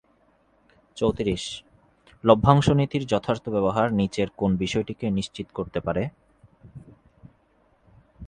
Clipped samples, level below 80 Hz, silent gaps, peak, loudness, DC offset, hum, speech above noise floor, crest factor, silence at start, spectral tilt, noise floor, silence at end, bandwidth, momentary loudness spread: under 0.1%; -48 dBFS; none; 0 dBFS; -24 LUFS; under 0.1%; none; 40 dB; 24 dB; 0.95 s; -6.5 dB/octave; -63 dBFS; 0 s; 10 kHz; 14 LU